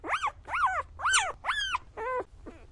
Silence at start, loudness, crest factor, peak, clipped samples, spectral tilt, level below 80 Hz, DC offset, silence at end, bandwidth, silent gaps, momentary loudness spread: 0.05 s; -30 LUFS; 20 dB; -10 dBFS; under 0.1%; -0.5 dB/octave; -54 dBFS; under 0.1%; 0 s; 11.5 kHz; none; 9 LU